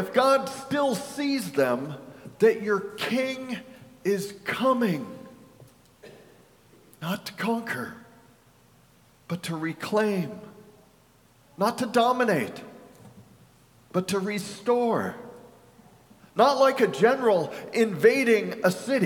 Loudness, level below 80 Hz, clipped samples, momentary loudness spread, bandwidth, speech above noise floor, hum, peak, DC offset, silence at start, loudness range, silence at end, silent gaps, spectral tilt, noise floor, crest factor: -25 LUFS; -68 dBFS; under 0.1%; 15 LU; 18 kHz; 34 dB; none; -6 dBFS; under 0.1%; 0 s; 10 LU; 0 s; none; -5 dB/octave; -59 dBFS; 22 dB